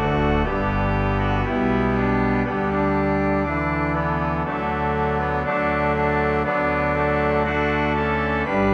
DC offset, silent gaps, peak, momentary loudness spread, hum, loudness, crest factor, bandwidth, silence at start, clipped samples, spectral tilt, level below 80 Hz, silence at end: under 0.1%; none; -6 dBFS; 2 LU; none; -21 LUFS; 14 dB; 7.8 kHz; 0 s; under 0.1%; -8.5 dB/octave; -32 dBFS; 0 s